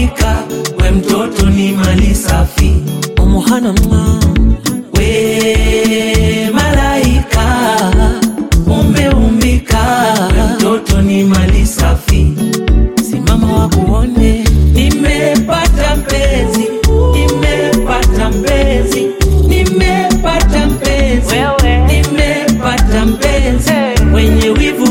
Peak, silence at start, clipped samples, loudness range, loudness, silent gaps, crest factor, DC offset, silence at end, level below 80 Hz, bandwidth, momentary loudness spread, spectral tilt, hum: 0 dBFS; 0 s; under 0.1%; 1 LU; -11 LUFS; none; 10 dB; under 0.1%; 0 s; -14 dBFS; 17 kHz; 3 LU; -5.5 dB/octave; none